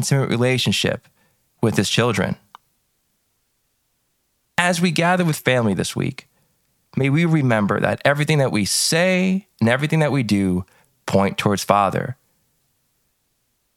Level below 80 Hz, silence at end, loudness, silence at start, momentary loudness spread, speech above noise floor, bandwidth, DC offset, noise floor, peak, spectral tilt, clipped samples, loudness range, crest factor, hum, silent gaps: -56 dBFS; 1.65 s; -19 LUFS; 0 s; 9 LU; 50 dB; 16.5 kHz; under 0.1%; -69 dBFS; 0 dBFS; -5 dB/octave; under 0.1%; 6 LU; 20 dB; none; none